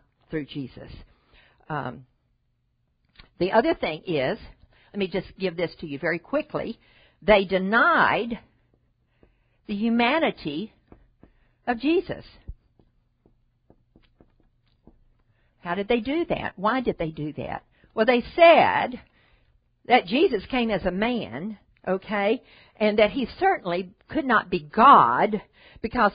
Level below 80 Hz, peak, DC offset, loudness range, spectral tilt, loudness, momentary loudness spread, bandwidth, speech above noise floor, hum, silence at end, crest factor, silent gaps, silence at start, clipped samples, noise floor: -52 dBFS; -2 dBFS; under 0.1%; 11 LU; -10 dB/octave; -23 LUFS; 18 LU; 5.2 kHz; 48 dB; none; 0 s; 22 dB; none; 0.3 s; under 0.1%; -71 dBFS